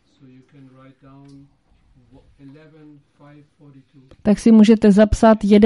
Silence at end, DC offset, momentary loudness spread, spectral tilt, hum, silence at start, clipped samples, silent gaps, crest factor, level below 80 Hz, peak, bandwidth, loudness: 0 s; under 0.1%; 8 LU; -7 dB/octave; none; 4.25 s; under 0.1%; none; 16 dB; -38 dBFS; -2 dBFS; 11.5 kHz; -13 LUFS